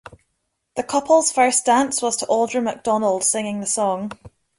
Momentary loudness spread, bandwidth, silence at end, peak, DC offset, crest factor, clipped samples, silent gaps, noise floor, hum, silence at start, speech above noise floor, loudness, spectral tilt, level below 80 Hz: 9 LU; 11.5 kHz; 0.3 s; -4 dBFS; under 0.1%; 18 dB; under 0.1%; none; -74 dBFS; none; 0.1 s; 54 dB; -19 LUFS; -2.5 dB/octave; -60 dBFS